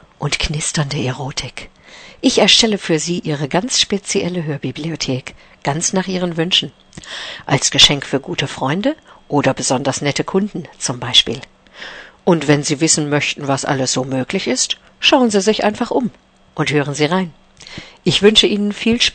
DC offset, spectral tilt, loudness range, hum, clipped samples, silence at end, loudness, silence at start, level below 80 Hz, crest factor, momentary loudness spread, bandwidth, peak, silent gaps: under 0.1%; -3.5 dB/octave; 3 LU; none; under 0.1%; 0.05 s; -16 LUFS; 0.2 s; -42 dBFS; 18 dB; 16 LU; 11 kHz; 0 dBFS; none